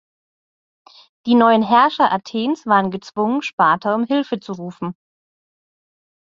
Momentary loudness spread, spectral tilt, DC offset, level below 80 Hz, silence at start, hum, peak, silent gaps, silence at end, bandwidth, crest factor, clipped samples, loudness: 15 LU; -6 dB/octave; under 0.1%; -66 dBFS; 1.25 s; none; -2 dBFS; 3.53-3.58 s; 1.35 s; 7.4 kHz; 18 dB; under 0.1%; -17 LUFS